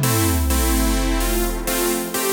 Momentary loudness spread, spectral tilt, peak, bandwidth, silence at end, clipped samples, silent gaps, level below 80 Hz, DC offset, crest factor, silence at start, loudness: 3 LU; -4 dB/octave; -6 dBFS; over 20 kHz; 0 s; under 0.1%; none; -24 dBFS; under 0.1%; 14 dB; 0 s; -20 LUFS